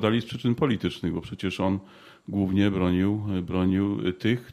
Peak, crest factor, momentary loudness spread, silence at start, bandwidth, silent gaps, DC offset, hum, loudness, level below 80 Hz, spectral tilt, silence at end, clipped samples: -8 dBFS; 18 dB; 8 LU; 0 s; 12 kHz; none; under 0.1%; none; -26 LUFS; -52 dBFS; -7.5 dB/octave; 0 s; under 0.1%